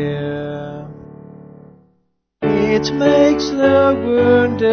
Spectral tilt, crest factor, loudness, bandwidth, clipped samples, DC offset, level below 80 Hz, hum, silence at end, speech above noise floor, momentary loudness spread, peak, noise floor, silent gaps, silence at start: -6 dB/octave; 14 dB; -15 LUFS; 6.6 kHz; under 0.1%; under 0.1%; -42 dBFS; none; 0 s; 51 dB; 15 LU; -2 dBFS; -64 dBFS; none; 0 s